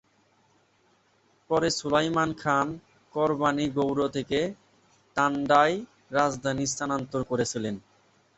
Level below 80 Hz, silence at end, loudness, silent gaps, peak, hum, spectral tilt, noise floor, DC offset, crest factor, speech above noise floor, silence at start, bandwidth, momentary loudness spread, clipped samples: -60 dBFS; 0.6 s; -27 LUFS; none; -6 dBFS; none; -4.5 dB/octave; -66 dBFS; under 0.1%; 22 dB; 40 dB; 1.5 s; 8.2 kHz; 11 LU; under 0.1%